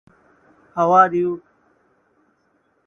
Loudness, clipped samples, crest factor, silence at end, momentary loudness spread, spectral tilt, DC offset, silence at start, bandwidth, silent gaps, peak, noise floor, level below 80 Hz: -17 LUFS; under 0.1%; 22 dB; 1.5 s; 18 LU; -7.5 dB/octave; under 0.1%; 0.75 s; 6.8 kHz; none; 0 dBFS; -64 dBFS; -64 dBFS